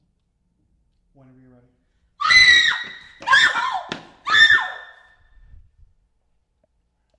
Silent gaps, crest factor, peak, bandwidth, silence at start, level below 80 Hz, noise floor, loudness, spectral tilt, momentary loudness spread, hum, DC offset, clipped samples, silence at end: none; 20 dB; -2 dBFS; 11.5 kHz; 2.2 s; -54 dBFS; -68 dBFS; -14 LUFS; 0.5 dB/octave; 21 LU; none; under 0.1%; under 0.1%; 2.35 s